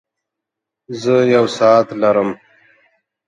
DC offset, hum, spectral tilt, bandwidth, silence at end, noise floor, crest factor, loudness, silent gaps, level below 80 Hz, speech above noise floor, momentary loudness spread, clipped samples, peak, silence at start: under 0.1%; none; -6 dB/octave; 10.5 kHz; 0.9 s; -82 dBFS; 16 dB; -14 LUFS; none; -62 dBFS; 68 dB; 13 LU; under 0.1%; 0 dBFS; 0.9 s